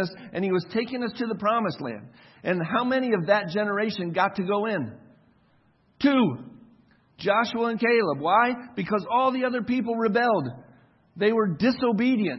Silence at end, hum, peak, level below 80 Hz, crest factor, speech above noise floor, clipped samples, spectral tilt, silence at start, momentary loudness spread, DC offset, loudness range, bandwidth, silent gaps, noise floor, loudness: 0 s; none; -6 dBFS; -66 dBFS; 18 dB; 38 dB; under 0.1%; -7.5 dB/octave; 0 s; 9 LU; under 0.1%; 3 LU; 6 kHz; none; -63 dBFS; -25 LUFS